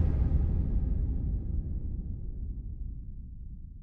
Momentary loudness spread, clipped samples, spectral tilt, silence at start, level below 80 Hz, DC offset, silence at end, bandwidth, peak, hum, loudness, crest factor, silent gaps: 17 LU; under 0.1%; -12 dB/octave; 0 s; -32 dBFS; under 0.1%; 0 s; 2.6 kHz; -16 dBFS; none; -34 LUFS; 14 dB; none